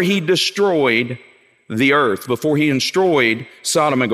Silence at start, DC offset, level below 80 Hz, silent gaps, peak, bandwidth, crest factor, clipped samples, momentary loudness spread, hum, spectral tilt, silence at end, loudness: 0 s; under 0.1%; -66 dBFS; none; -2 dBFS; 16 kHz; 16 dB; under 0.1%; 7 LU; none; -4 dB/octave; 0 s; -16 LUFS